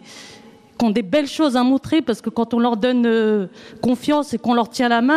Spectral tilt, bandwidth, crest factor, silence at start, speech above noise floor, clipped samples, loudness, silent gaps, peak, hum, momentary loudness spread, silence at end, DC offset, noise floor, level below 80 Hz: -5.5 dB/octave; 13 kHz; 14 dB; 0.1 s; 27 dB; under 0.1%; -19 LUFS; none; -6 dBFS; none; 6 LU; 0 s; under 0.1%; -44 dBFS; -58 dBFS